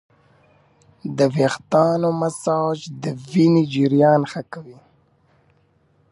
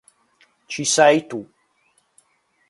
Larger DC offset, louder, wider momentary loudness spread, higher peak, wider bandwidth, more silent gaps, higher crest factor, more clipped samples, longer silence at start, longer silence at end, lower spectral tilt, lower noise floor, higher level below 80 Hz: neither; about the same, -19 LUFS vs -17 LUFS; second, 15 LU vs 19 LU; about the same, -2 dBFS vs 0 dBFS; about the same, 11.5 kHz vs 11.5 kHz; neither; about the same, 18 dB vs 22 dB; neither; first, 1.05 s vs 0.7 s; first, 1.4 s vs 1.25 s; first, -7 dB/octave vs -2.5 dB/octave; second, -60 dBFS vs -65 dBFS; first, -64 dBFS vs -70 dBFS